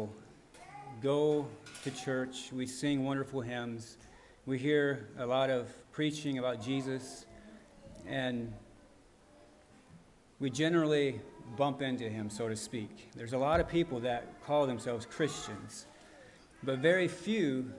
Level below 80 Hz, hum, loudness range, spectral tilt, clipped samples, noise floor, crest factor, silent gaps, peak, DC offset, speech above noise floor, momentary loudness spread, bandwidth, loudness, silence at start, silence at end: -60 dBFS; none; 5 LU; -5.5 dB/octave; under 0.1%; -61 dBFS; 20 dB; none; -14 dBFS; under 0.1%; 27 dB; 18 LU; 11.5 kHz; -34 LUFS; 0 s; 0 s